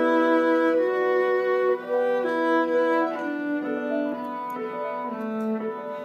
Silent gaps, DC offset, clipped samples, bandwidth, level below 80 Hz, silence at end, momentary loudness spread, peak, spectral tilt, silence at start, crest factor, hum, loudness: none; under 0.1%; under 0.1%; 12 kHz; -86 dBFS; 0 s; 10 LU; -12 dBFS; -6.5 dB/octave; 0 s; 12 dB; none; -24 LUFS